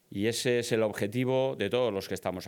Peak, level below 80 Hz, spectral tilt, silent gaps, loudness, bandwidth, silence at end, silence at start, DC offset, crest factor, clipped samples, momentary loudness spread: -14 dBFS; -72 dBFS; -5 dB/octave; none; -29 LUFS; 19 kHz; 0 s; 0.1 s; under 0.1%; 16 dB; under 0.1%; 4 LU